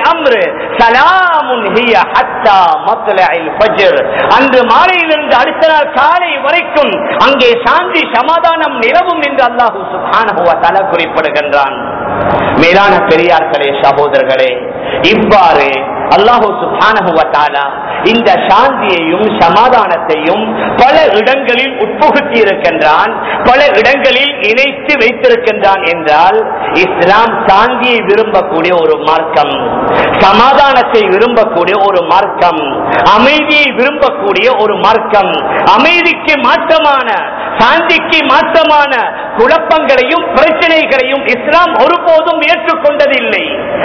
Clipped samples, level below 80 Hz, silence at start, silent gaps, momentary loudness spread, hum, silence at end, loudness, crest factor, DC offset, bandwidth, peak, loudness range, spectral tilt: 5%; -40 dBFS; 0 s; none; 5 LU; none; 0 s; -7 LUFS; 8 dB; 0.3%; 5.4 kHz; 0 dBFS; 1 LU; -5 dB/octave